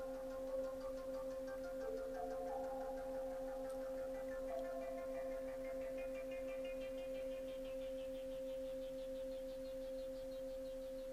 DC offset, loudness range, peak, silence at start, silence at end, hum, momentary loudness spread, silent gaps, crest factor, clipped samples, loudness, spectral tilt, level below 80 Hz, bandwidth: under 0.1%; 2 LU; -34 dBFS; 0 s; 0 s; none; 3 LU; none; 12 dB; under 0.1%; -47 LUFS; -5 dB/octave; -60 dBFS; 15.5 kHz